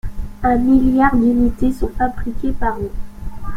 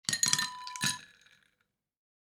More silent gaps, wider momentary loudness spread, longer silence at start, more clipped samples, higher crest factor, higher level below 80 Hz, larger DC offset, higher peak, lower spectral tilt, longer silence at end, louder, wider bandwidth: neither; first, 18 LU vs 10 LU; about the same, 0.05 s vs 0.1 s; neither; second, 14 dB vs 30 dB; first, -26 dBFS vs -78 dBFS; neither; first, -2 dBFS vs -6 dBFS; first, -8.5 dB/octave vs 0 dB/octave; second, 0 s vs 1.2 s; first, -17 LUFS vs -30 LUFS; second, 12.5 kHz vs over 20 kHz